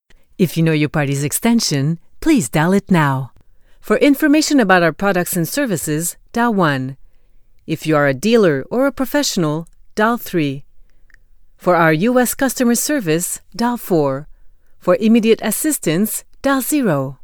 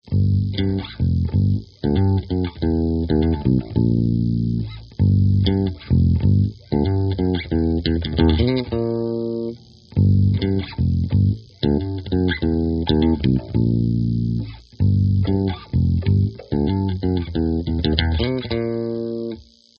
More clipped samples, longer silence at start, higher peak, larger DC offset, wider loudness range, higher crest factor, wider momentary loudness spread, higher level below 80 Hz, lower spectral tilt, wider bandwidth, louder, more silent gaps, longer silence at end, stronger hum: neither; first, 0.4 s vs 0.05 s; about the same, 0 dBFS vs 0 dBFS; neither; about the same, 3 LU vs 2 LU; about the same, 16 dB vs 18 dB; first, 9 LU vs 6 LU; second, -44 dBFS vs -34 dBFS; second, -5 dB/octave vs -7.5 dB/octave; first, over 20 kHz vs 5.6 kHz; first, -16 LUFS vs -20 LUFS; neither; second, 0.1 s vs 0.35 s; neither